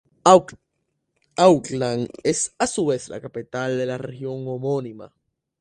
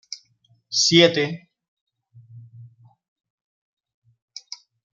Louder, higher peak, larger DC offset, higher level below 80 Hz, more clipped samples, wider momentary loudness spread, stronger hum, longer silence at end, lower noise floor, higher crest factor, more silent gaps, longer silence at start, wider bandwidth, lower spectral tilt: second, -21 LUFS vs -18 LUFS; about the same, 0 dBFS vs -2 dBFS; neither; first, -60 dBFS vs -70 dBFS; neither; second, 16 LU vs 26 LU; neither; second, 0.55 s vs 2.3 s; first, -75 dBFS vs -63 dBFS; about the same, 22 dB vs 24 dB; second, none vs 1.68-1.87 s; first, 0.25 s vs 0.1 s; first, 11 kHz vs 9 kHz; about the same, -4.5 dB/octave vs -3.5 dB/octave